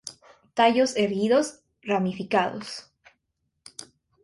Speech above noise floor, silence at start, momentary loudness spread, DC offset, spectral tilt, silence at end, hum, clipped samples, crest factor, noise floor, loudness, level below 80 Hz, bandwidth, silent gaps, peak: 54 dB; 0.05 s; 22 LU; under 0.1%; -4.5 dB/octave; 0.4 s; none; under 0.1%; 20 dB; -77 dBFS; -24 LUFS; -66 dBFS; 11.5 kHz; none; -6 dBFS